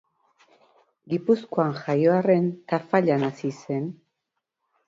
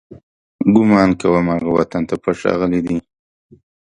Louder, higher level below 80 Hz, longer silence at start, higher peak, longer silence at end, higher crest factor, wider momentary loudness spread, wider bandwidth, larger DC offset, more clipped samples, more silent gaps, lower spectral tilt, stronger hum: second, -24 LUFS vs -16 LUFS; second, -70 dBFS vs -46 dBFS; first, 1.1 s vs 0.1 s; second, -6 dBFS vs 0 dBFS; about the same, 0.95 s vs 0.95 s; about the same, 20 dB vs 16 dB; about the same, 10 LU vs 8 LU; second, 7.6 kHz vs 9.4 kHz; neither; neither; second, none vs 0.23-0.59 s; about the same, -8 dB/octave vs -8 dB/octave; neither